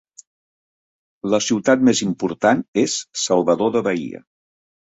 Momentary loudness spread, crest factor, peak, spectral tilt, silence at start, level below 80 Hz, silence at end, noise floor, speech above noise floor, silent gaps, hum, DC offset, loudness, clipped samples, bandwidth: 10 LU; 18 dB; -2 dBFS; -4 dB/octave; 1.25 s; -60 dBFS; 0.65 s; under -90 dBFS; over 72 dB; 2.68-2.73 s; none; under 0.1%; -19 LUFS; under 0.1%; 8 kHz